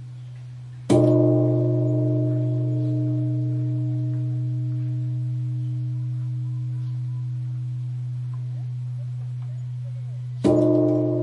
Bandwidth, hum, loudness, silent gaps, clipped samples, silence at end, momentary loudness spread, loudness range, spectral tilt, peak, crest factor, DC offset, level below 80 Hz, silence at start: 10.5 kHz; none; -24 LUFS; none; under 0.1%; 0 s; 13 LU; 8 LU; -10 dB/octave; -6 dBFS; 16 dB; under 0.1%; -60 dBFS; 0 s